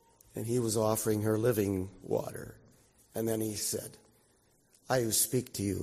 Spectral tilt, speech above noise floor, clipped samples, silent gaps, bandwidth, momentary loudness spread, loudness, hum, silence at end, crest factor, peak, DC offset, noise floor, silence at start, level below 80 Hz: -4.5 dB/octave; 36 dB; under 0.1%; none; 15.5 kHz; 15 LU; -32 LUFS; none; 0 s; 18 dB; -14 dBFS; under 0.1%; -68 dBFS; 0.35 s; -64 dBFS